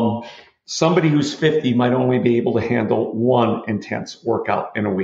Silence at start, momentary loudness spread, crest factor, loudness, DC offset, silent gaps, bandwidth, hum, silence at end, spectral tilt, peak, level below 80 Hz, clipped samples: 0 s; 9 LU; 16 dB; -19 LUFS; under 0.1%; none; 8 kHz; none; 0 s; -6.5 dB/octave; -2 dBFS; -60 dBFS; under 0.1%